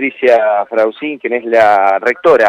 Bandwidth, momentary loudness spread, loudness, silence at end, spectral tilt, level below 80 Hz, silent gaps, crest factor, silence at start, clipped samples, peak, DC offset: 9.8 kHz; 8 LU; -12 LUFS; 0 s; -5 dB/octave; -58 dBFS; none; 10 dB; 0 s; under 0.1%; 0 dBFS; under 0.1%